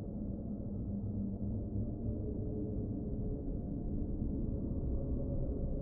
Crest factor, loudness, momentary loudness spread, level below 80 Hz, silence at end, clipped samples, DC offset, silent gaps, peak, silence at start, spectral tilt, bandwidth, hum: 12 dB; -40 LUFS; 3 LU; -42 dBFS; 0 s; under 0.1%; under 0.1%; none; -24 dBFS; 0 s; -15 dB/octave; 1.6 kHz; none